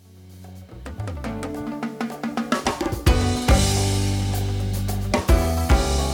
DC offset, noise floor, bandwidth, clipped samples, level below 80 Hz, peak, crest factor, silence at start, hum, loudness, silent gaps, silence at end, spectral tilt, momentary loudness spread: under 0.1%; -43 dBFS; 18 kHz; under 0.1%; -26 dBFS; -6 dBFS; 16 dB; 0.15 s; none; -23 LUFS; none; 0 s; -5 dB/octave; 14 LU